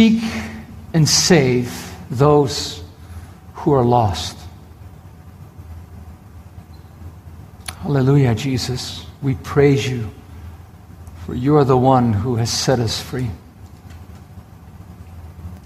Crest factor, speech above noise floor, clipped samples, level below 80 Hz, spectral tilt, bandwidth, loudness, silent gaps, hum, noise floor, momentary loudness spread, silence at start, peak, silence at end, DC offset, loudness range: 18 dB; 24 dB; under 0.1%; -42 dBFS; -5.5 dB/octave; 15 kHz; -17 LUFS; none; none; -40 dBFS; 25 LU; 0 s; 0 dBFS; 0 s; under 0.1%; 8 LU